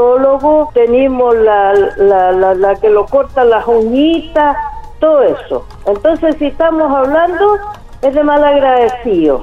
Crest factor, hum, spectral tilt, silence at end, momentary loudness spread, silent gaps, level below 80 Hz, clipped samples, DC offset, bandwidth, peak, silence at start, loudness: 8 dB; none; -7 dB/octave; 0 s; 6 LU; none; -34 dBFS; under 0.1%; under 0.1%; 7.4 kHz; -2 dBFS; 0 s; -11 LUFS